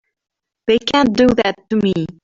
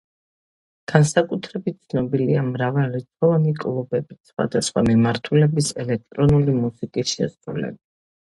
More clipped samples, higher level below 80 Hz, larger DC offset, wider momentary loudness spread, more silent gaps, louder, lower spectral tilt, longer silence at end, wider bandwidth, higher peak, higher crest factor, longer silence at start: neither; about the same, -44 dBFS vs -48 dBFS; neither; second, 6 LU vs 11 LU; second, none vs 4.20-4.24 s; first, -16 LUFS vs -21 LUFS; about the same, -6 dB/octave vs -6 dB/octave; second, 0.15 s vs 0.55 s; second, 7.6 kHz vs 11.5 kHz; about the same, -2 dBFS vs 0 dBFS; second, 14 dB vs 20 dB; second, 0.65 s vs 0.9 s